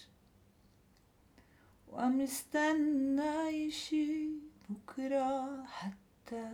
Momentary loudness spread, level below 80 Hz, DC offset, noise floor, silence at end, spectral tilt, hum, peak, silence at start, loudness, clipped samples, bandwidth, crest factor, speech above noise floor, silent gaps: 15 LU; -72 dBFS; under 0.1%; -67 dBFS; 0 s; -4 dB/octave; none; -22 dBFS; 0 s; -36 LUFS; under 0.1%; 18.5 kHz; 16 dB; 32 dB; none